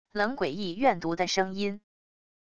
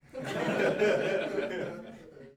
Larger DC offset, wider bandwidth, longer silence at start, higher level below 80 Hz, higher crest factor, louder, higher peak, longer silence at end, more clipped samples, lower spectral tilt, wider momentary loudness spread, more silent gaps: first, 0.5% vs under 0.1%; second, 10 kHz vs 15.5 kHz; about the same, 0.05 s vs 0.15 s; about the same, -62 dBFS vs -66 dBFS; about the same, 20 dB vs 16 dB; about the same, -29 LUFS vs -30 LUFS; first, -10 dBFS vs -16 dBFS; first, 0.7 s vs 0.05 s; neither; about the same, -4.5 dB/octave vs -5.5 dB/octave; second, 7 LU vs 18 LU; neither